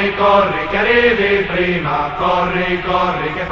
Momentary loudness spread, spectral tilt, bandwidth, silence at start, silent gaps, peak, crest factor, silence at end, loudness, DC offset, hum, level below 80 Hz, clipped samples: 6 LU; -3 dB/octave; 7.2 kHz; 0 s; none; 0 dBFS; 14 dB; 0 s; -15 LUFS; 0.2%; none; -36 dBFS; under 0.1%